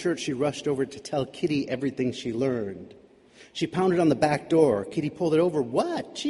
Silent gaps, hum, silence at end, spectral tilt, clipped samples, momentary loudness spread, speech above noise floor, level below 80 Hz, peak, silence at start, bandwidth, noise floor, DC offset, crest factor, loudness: none; none; 0 s; -6 dB/octave; under 0.1%; 9 LU; 28 dB; -60 dBFS; -8 dBFS; 0 s; 11.5 kHz; -54 dBFS; under 0.1%; 18 dB; -26 LUFS